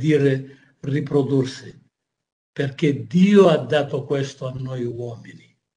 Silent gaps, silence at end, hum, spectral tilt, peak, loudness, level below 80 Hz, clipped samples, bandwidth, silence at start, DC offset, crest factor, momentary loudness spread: 2.32-2.53 s; 0.4 s; none; -7.5 dB/octave; -2 dBFS; -20 LUFS; -62 dBFS; under 0.1%; 10 kHz; 0 s; under 0.1%; 18 dB; 19 LU